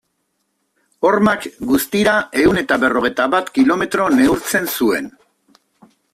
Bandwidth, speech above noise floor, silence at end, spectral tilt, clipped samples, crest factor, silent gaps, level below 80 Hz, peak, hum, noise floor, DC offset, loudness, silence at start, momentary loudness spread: 16 kHz; 54 dB; 1.05 s; -4.5 dB/octave; under 0.1%; 14 dB; none; -48 dBFS; -2 dBFS; none; -69 dBFS; under 0.1%; -16 LUFS; 1 s; 5 LU